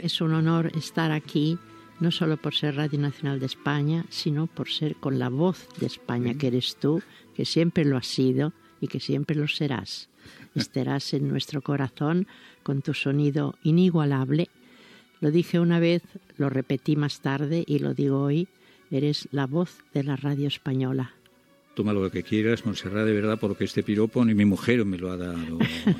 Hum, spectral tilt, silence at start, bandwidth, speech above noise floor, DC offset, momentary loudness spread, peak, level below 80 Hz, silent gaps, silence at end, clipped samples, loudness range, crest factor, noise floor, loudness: none; -7 dB/octave; 0 s; 14 kHz; 34 dB; under 0.1%; 9 LU; -6 dBFS; -66 dBFS; none; 0 s; under 0.1%; 4 LU; 18 dB; -59 dBFS; -26 LUFS